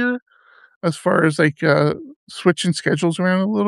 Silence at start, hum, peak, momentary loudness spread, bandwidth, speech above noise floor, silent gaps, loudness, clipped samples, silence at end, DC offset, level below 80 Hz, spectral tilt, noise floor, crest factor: 0 s; none; -2 dBFS; 9 LU; 12 kHz; 34 dB; 0.22-0.26 s, 0.76-0.81 s, 2.16-2.27 s; -19 LUFS; under 0.1%; 0 s; under 0.1%; -64 dBFS; -6 dB/octave; -52 dBFS; 18 dB